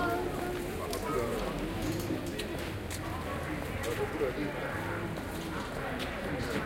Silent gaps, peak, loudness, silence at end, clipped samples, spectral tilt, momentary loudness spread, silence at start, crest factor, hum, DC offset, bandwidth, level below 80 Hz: none; -20 dBFS; -35 LUFS; 0 s; under 0.1%; -5 dB/octave; 4 LU; 0 s; 16 dB; none; under 0.1%; 17 kHz; -46 dBFS